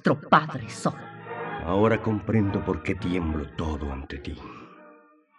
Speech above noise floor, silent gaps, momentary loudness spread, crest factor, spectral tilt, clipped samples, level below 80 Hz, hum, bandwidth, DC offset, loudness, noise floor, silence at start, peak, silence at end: 29 dB; none; 17 LU; 22 dB; -7 dB/octave; under 0.1%; -44 dBFS; none; 11 kHz; under 0.1%; -26 LUFS; -55 dBFS; 0.05 s; -4 dBFS; 0.45 s